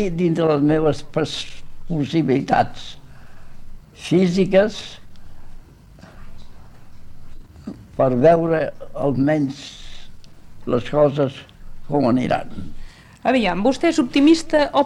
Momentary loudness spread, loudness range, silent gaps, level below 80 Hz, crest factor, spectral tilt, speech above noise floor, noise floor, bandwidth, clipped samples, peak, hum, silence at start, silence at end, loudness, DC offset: 21 LU; 4 LU; none; -38 dBFS; 16 dB; -6.5 dB/octave; 26 dB; -44 dBFS; 11.5 kHz; under 0.1%; -4 dBFS; none; 0 s; 0 s; -19 LUFS; under 0.1%